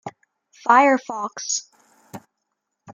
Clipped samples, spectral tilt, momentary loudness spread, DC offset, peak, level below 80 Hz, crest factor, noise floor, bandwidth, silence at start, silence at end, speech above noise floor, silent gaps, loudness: under 0.1%; -2 dB/octave; 14 LU; under 0.1%; -2 dBFS; -82 dBFS; 20 dB; -78 dBFS; 15.5 kHz; 0.05 s; 0 s; 59 dB; none; -20 LUFS